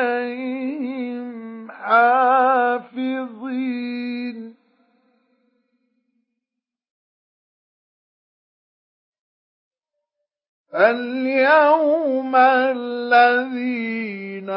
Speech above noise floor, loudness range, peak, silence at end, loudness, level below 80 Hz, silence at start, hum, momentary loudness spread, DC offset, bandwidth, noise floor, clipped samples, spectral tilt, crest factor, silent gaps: 68 dB; 14 LU; -2 dBFS; 0 s; -19 LUFS; -86 dBFS; 0 s; none; 16 LU; under 0.1%; 5.8 kHz; -85 dBFS; under 0.1%; -9 dB/octave; 20 dB; 6.90-9.12 s, 9.19-9.71 s, 10.48-10.65 s